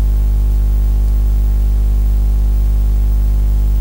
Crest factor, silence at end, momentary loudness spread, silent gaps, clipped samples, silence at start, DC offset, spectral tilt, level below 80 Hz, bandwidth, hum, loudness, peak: 6 dB; 0 s; 0 LU; none; under 0.1%; 0 s; under 0.1%; -8 dB/octave; -12 dBFS; 16 kHz; 50 Hz at -10 dBFS; -16 LUFS; -6 dBFS